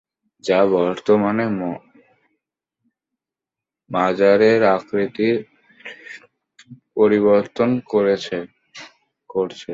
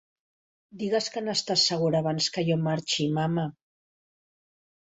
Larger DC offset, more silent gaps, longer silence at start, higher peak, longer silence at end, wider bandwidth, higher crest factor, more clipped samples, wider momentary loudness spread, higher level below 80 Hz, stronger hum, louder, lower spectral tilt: neither; neither; second, 0.45 s vs 0.75 s; first, -2 dBFS vs -10 dBFS; second, 0 s vs 1.4 s; about the same, 7.8 kHz vs 8.2 kHz; about the same, 18 dB vs 18 dB; neither; first, 23 LU vs 6 LU; first, -62 dBFS vs -68 dBFS; neither; first, -18 LUFS vs -26 LUFS; first, -6.5 dB/octave vs -4.5 dB/octave